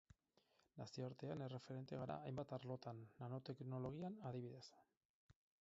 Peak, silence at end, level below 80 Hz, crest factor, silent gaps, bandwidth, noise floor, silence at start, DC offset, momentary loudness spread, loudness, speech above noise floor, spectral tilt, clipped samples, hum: -34 dBFS; 0.3 s; -80 dBFS; 18 dB; 4.97-5.29 s; 7.6 kHz; -81 dBFS; 0.75 s; under 0.1%; 7 LU; -52 LUFS; 30 dB; -7 dB/octave; under 0.1%; none